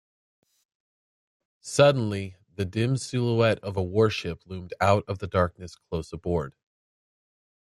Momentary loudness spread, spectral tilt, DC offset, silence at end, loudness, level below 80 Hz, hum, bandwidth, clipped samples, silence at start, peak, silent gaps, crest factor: 17 LU; -6 dB/octave; under 0.1%; 1.2 s; -26 LUFS; -56 dBFS; none; 12.5 kHz; under 0.1%; 1.65 s; -6 dBFS; none; 22 dB